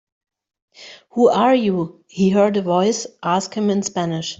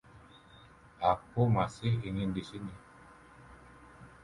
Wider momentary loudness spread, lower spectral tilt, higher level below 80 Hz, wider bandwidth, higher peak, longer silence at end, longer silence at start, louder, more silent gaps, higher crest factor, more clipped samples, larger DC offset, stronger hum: second, 9 LU vs 25 LU; second, -5.5 dB/octave vs -7.5 dB/octave; about the same, -60 dBFS vs -56 dBFS; second, 8 kHz vs 11 kHz; first, -2 dBFS vs -14 dBFS; about the same, 0.05 s vs 0.15 s; first, 0.8 s vs 0.15 s; first, -18 LUFS vs -33 LUFS; neither; second, 16 dB vs 22 dB; neither; neither; neither